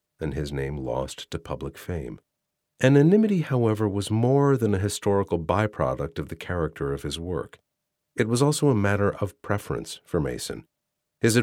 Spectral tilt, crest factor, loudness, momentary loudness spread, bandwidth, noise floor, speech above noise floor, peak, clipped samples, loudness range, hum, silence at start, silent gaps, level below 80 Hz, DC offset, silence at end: -6 dB/octave; 18 dB; -25 LUFS; 13 LU; 16.5 kHz; -81 dBFS; 57 dB; -6 dBFS; under 0.1%; 5 LU; none; 0.2 s; none; -46 dBFS; under 0.1%; 0 s